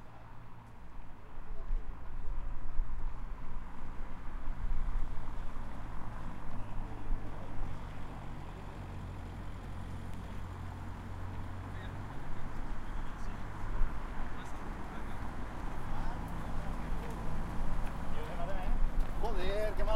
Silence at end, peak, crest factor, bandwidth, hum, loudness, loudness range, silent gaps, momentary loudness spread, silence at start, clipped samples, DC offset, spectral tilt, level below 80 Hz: 0 s; -16 dBFS; 16 dB; 5.4 kHz; none; -43 LUFS; 5 LU; none; 9 LU; 0 s; under 0.1%; under 0.1%; -6.5 dB/octave; -38 dBFS